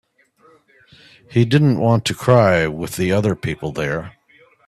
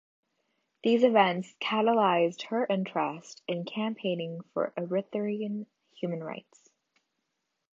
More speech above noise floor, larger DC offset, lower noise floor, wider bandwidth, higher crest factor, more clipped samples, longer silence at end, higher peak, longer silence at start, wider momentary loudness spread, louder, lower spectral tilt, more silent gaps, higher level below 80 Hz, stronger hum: second, 38 dB vs 53 dB; neither; second, -54 dBFS vs -81 dBFS; first, 14 kHz vs 7.6 kHz; about the same, 18 dB vs 22 dB; neither; second, 0.55 s vs 1.35 s; first, 0 dBFS vs -8 dBFS; first, 1.3 s vs 0.85 s; second, 10 LU vs 14 LU; first, -18 LUFS vs -29 LUFS; about the same, -6.5 dB/octave vs -6 dB/octave; neither; first, -48 dBFS vs -84 dBFS; neither